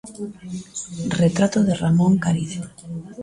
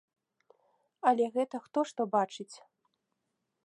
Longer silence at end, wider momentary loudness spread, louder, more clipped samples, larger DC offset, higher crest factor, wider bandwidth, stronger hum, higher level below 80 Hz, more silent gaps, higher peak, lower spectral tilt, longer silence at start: second, 0 s vs 1.1 s; first, 16 LU vs 11 LU; first, -20 LUFS vs -31 LUFS; neither; neither; second, 16 dB vs 22 dB; about the same, 11.5 kHz vs 11 kHz; neither; first, -52 dBFS vs -88 dBFS; neither; first, -6 dBFS vs -12 dBFS; first, -6.5 dB/octave vs -5 dB/octave; second, 0.05 s vs 1.05 s